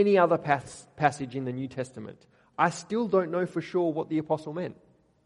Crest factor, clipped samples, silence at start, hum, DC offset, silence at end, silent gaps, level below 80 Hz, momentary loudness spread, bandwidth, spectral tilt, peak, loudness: 20 dB; under 0.1%; 0 s; none; under 0.1%; 0.5 s; none; -68 dBFS; 14 LU; 11 kHz; -6.5 dB/octave; -8 dBFS; -28 LUFS